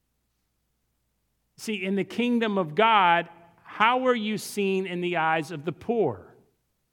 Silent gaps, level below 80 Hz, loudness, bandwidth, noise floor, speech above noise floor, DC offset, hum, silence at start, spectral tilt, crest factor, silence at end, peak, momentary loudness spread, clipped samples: none; -72 dBFS; -25 LUFS; 18 kHz; -75 dBFS; 50 dB; under 0.1%; none; 1.6 s; -5 dB/octave; 20 dB; 0.7 s; -6 dBFS; 14 LU; under 0.1%